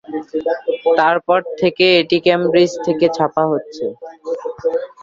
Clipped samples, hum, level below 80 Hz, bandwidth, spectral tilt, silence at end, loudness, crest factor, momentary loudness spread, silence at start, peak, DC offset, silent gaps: under 0.1%; none; -60 dBFS; 7.6 kHz; -5.5 dB/octave; 0.15 s; -16 LUFS; 16 dB; 13 LU; 0.1 s; 0 dBFS; under 0.1%; none